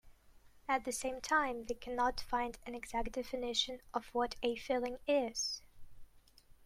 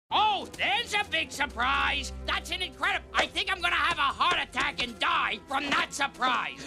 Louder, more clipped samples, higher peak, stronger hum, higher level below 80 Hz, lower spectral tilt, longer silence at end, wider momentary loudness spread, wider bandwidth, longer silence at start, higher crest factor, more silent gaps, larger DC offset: second, -37 LUFS vs -27 LUFS; neither; second, -20 dBFS vs -8 dBFS; neither; second, -56 dBFS vs -48 dBFS; about the same, -2 dB/octave vs -2 dB/octave; first, 0.45 s vs 0 s; first, 8 LU vs 5 LU; about the same, 16 kHz vs 15 kHz; about the same, 0.05 s vs 0.1 s; about the same, 20 dB vs 20 dB; neither; neither